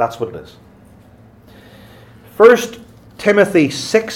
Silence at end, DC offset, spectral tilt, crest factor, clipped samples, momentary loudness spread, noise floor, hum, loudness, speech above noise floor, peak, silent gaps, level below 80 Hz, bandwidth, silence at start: 0 s; under 0.1%; -4.5 dB/octave; 16 dB; under 0.1%; 17 LU; -44 dBFS; none; -13 LUFS; 31 dB; 0 dBFS; none; -54 dBFS; 16.5 kHz; 0 s